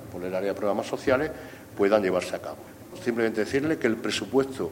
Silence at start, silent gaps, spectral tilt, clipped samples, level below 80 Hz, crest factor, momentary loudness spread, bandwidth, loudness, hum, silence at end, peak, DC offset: 0 s; none; -5 dB/octave; under 0.1%; -58 dBFS; 20 dB; 15 LU; 16.5 kHz; -27 LUFS; none; 0 s; -6 dBFS; under 0.1%